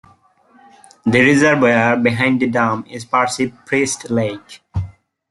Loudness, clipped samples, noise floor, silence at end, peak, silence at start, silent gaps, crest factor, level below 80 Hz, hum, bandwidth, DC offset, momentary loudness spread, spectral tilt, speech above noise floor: -16 LUFS; under 0.1%; -52 dBFS; 0.4 s; -2 dBFS; 1.05 s; none; 16 dB; -50 dBFS; none; 12 kHz; under 0.1%; 15 LU; -5 dB/octave; 36 dB